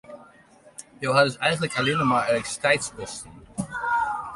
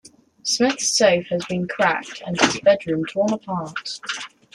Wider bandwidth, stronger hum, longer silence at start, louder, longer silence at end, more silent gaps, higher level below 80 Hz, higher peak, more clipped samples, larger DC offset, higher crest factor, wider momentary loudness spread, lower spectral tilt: about the same, 11.5 kHz vs 12.5 kHz; neither; second, 0.1 s vs 0.45 s; second, -24 LUFS vs -21 LUFS; second, 0 s vs 0.25 s; neither; about the same, -56 dBFS vs -60 dBFS; second, -6 dBFS vs -2 dBFS; neither; neither; about the same, 20 dB vs 20 dB; first, 17 LU vs 12 LU; about the same, -4 dB/octave vs -3 dB/octave